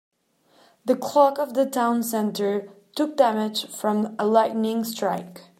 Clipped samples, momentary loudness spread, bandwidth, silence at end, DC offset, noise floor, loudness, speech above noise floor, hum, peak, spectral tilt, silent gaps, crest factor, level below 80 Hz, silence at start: under 0.1%; 8 LU; 16 kHz; 0.2 s; under 0.1%; -62 dBFS; -23 LUFS; 39 dB; none; -4 dBFS; -4.5 dB/octave; none; 20 dB; -78 dBFS; 0.85 s